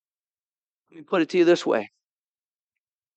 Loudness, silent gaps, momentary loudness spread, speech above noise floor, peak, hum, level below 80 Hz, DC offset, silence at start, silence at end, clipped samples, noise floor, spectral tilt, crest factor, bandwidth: -22 LUFS; none; 8 LU; over 68 dB; -8 dBFS; none; -88 dBFS; under 0.1%; 0.95 s; 1.3 s; under 0.1%; under -90 dBFS; -5.5 dB/octave; 18 dB; 8.4 kHz